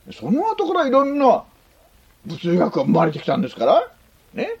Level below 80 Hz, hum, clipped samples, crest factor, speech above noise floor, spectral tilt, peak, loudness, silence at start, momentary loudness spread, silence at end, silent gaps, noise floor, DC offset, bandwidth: -58 dBFS; none; under 0.1%; 18 dB; 36 dB; -7.5 dB/octave; -2 dBFS; -19 LUFS; 0.05 s; 12 LU; 0.05 s; none; -54 dBFS; under 0.1%; 16 kHz